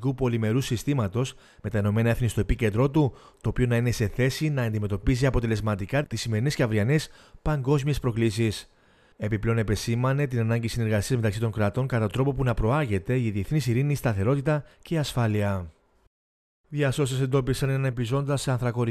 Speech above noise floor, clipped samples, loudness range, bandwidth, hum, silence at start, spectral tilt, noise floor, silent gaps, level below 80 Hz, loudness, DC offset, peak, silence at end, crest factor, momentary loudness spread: over 65 dB; under 0.1%; 2 LU; 14 kHz; none; 0 s; -6.5 dB/octave; under -90 dBFS; 16.07-16.64 s; -40 dBFS; -26 LUFS; under 0.1%; -8 dBFS; 0 s; 16 dB; 5 LU